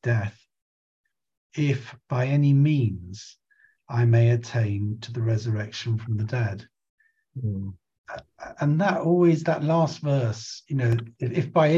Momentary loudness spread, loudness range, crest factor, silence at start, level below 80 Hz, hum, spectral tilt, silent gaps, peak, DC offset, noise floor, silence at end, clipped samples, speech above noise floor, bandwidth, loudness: 18 LU; 6 LU; 16 dB; 0.05 s; -54 dBFS; none; -7.5 dB/octave; 0.62-1.04 s, 1.37-1.50 s, 6.90-6.98 s, 7.98-8.04 s; -8 dBFS; under 0.1%; -58 dBFS; 0 s; under 0.1%; 35 dB; 7.6 kHz; -24 LUFS